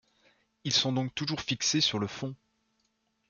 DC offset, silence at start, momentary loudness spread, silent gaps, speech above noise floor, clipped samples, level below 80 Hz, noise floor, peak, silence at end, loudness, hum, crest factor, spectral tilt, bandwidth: under 0.1%; 0.65 s; 14 LU; none; 45 dB; under 0.1%; -66 dBFS; -76 dBFS; -12 dBFS; 0.95 s; -29 LUFS; none; 22 dB; -3 dB/octave; 10 kHz